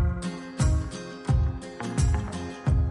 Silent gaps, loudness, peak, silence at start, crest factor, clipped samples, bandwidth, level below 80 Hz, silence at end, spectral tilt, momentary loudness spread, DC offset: none; -28 LUFS; -12 dBFS; 0 s; 14 dB; under 0.1%; 11.5 kHz; -30 dBFS; 0 s; -6.5 dB/octave; 9 LU; under 0.1%